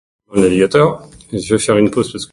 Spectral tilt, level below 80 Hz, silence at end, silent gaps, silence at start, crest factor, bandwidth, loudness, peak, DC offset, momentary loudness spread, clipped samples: -5.5 dB/octave; -44 dBFS; 0.1 s; none; 0.3 s; 14 dB; 11.5 kHz; -14 LUFS; 0 dBFS; under 0.1%; 13 LU; under 0.1%